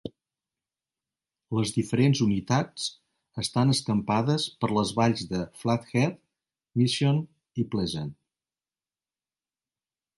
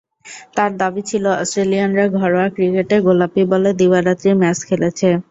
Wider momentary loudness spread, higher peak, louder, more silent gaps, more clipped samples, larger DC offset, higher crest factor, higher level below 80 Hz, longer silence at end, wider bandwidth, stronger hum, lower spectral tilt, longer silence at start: first, 10 LU vs 5 LU; second, -10 dBFS vs -2 dBFS; second, -27 LUFS vs -16 LUFS; neither; neither; neither; about the same, 18 dB vs 14 dB; about the same, -58 dBFS vs -56 dBFS; first, 2.05 s vs 0.1 s; first, 11.5 kHz vs 8 kHz; neither; about the same, -5.5 dB/octave vs -6 dB/octave; second, 0.05 s vs 0.25 s